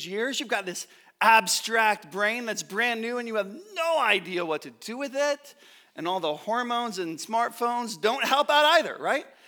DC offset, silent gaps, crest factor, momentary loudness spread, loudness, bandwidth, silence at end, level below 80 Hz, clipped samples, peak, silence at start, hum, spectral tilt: under 0.1%; none; 22 dB; 13 LU; -25 LUFS; over 20 kHz; 0.2 s; -88 dBFS; under 0.1%; -6 dBFS; 0 s; none; -2 dB/octave